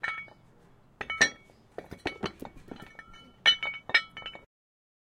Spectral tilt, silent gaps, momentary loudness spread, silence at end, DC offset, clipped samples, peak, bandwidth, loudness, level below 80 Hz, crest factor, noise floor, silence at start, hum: -1 dB/octave; none; 24 LU; 0.6 s; under 0.1%; under 0.1%; -6 dBFS; 16 kHz; -28 LUFS; -62 dBFS; 28 dB; -59 dBFS; 0.05 s; none